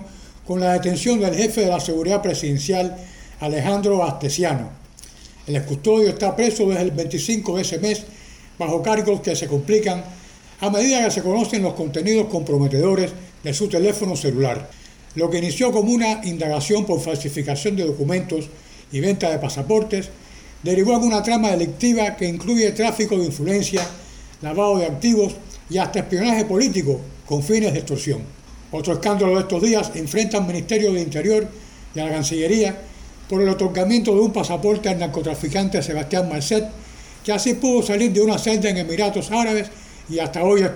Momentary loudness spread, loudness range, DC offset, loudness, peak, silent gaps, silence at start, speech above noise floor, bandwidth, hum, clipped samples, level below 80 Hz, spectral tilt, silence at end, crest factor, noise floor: 10 LU; 2 LU; under 0.1%; -20 LUFS; -6 dBFS; none; 0 s; 23 dB; 19.5 kHz; none; under 0.1%; -44 dBFS; -5 dB/octave; 0 s; 16 dB; -43 dBFS